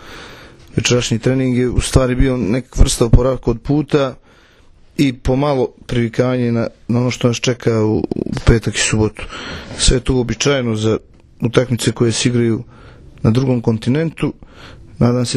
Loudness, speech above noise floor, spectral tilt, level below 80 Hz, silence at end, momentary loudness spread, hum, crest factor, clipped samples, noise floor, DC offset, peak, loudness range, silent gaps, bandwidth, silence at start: -16 LUFS; 31 dB; -5.5 dB/octave; -24 dBFS; 0 s; 9 LU; none; 16 dB; 0.1%; -46 dBFS; under 0.1%; 0 dBFS; 2 LU; none; 13 kHz; 0 s